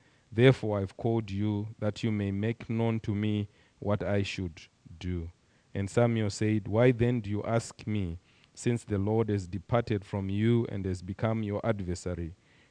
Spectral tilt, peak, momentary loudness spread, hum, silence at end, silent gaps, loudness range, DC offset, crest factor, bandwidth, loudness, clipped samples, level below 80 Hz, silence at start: -7 dB/octave; -6 dBFS; 12 LU; none; 0.35 s; none; 3 LU; under 0.1%; 24 dB; 10 kHz; -30 LUFS; under 0.1%; -54 dBFS; 0.3 s